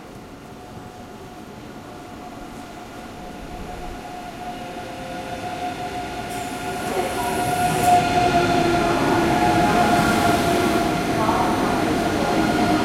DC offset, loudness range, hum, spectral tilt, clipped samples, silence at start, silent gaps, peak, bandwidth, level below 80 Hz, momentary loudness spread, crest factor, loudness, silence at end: under 0.1%; 18 LU; none; -5 dB/octave; under 0.1%; 0 s; none; -6 dBFS; 16.5 kHz; -42 dBFS; 20 LU; 16 dB; -20 LUFS; 0 s